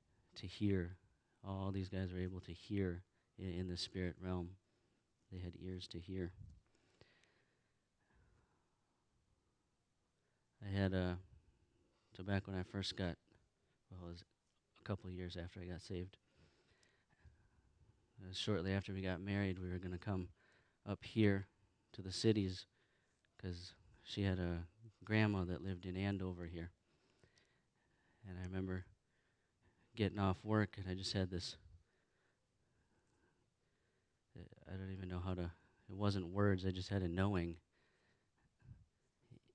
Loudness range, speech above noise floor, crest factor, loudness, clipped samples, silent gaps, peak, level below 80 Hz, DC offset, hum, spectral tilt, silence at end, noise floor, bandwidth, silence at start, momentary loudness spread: 11 LU; 42 dB; 24 dB; -43 LUFS; under 0.1%; none; -20 dBFS; -66 dBFS; under 0.1%; none; -6.5 dB/octave; 0.75 s; -84 dBFS; 9.8 kHz; 0.35 s; 19 LU